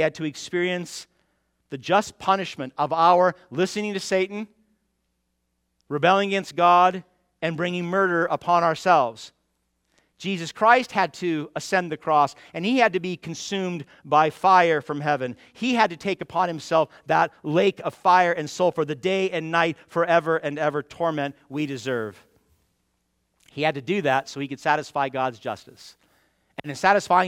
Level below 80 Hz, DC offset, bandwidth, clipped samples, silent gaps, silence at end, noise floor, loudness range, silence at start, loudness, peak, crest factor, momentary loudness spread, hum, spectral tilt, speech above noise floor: -68 dBFS; under 0.1%; 15.5 kHz; under 0.1%; none; 0 s; -74 dBFS; 5 LU; 0 s; -23 LUFS; -2 dBFS; 22 dB; 13 LU; none; -5 dB/octave; 52 dB